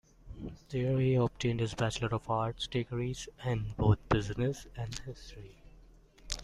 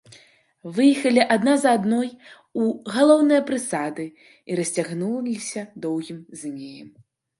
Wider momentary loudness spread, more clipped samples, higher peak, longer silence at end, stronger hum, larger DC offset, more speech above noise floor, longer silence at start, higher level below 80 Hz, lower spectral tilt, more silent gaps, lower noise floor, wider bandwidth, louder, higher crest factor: about the same, 17 LU vs 17 LU; neither; second, -14 dBFS vs -2 dBFS; second, 0 s vs 0.5 s; neither; neither; second, 25 dB vs 33 dB; second, 0.25 s vs 0.65 s; first, -50 dBFS vs -72 dBFS; first, -6 dB/octave vs -4.5 dB/octave; neither; about the same, -58 dBFS vs -55 dBFS; about the same, 12 kHz vs 11.5 kHz; second, -33 LUFS vs -21 LUFS; about the same, 20 dB vs 20 dB